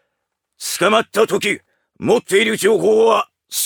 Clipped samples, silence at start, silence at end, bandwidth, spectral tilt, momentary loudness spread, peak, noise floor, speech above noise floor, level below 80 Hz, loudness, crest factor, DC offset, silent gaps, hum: under 0.1%; 0.6 s; 0 s; 19.5 kHz; -3 dB/octave; 11 LU; 0 dBFS; -76 dBFS; 61 dB; -66 dBFS; -16 LUFS; 16 dB; under 0.1%; none; none